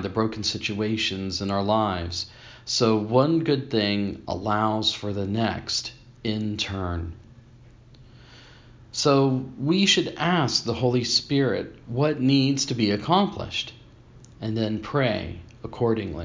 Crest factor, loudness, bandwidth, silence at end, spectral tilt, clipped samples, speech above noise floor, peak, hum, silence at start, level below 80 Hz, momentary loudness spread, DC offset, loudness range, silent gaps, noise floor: 20 dB; -24 LUFS; 7.6 kHz; 0 s; -5 dB/octave; under 0.1%; 26 dB; -6 dBFS; none; 0 s; -46 dBFS; 10 LU; under 0.1%; 6 LU; none; -50 dBFS